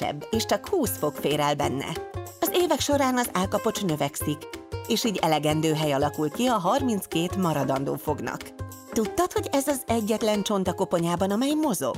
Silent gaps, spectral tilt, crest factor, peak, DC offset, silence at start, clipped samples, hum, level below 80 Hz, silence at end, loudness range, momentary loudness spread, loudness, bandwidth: none; -4.5 dB/octave; 16 dB; -10 dBFS; under 0.1%; 0 s; under 0.1%; none; -52 dBFS; 0 s; 2 LU; 8 LU; -26 LUFS; 16 kHz